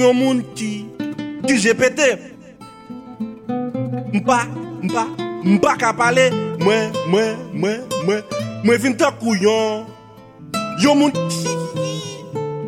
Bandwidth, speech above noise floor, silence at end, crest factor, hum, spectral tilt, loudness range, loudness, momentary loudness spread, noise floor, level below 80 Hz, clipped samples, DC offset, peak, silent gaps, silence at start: 16 kHz; 25 dB; 0 s; 16 dB; none; -5 dB/octave; 3 LU; -19 LUFS; 13 LU; -41 dBFS; -58 dBFS; under 0.1%; under 0.1%; -2 dBFS; none; 0 s